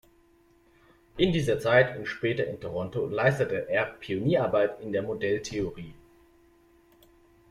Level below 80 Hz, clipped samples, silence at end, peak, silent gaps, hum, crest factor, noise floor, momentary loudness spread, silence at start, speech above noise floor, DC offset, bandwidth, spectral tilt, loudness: -54 dBFS; under 0.1%; 1.55 s; -8 dBFS; none; none; 20 dB; -62 dBFS; 11 LU; 1.15 s; 35 dB; under 0.1%; 14.5 kHz; -6 dB/octave; -27 LUFS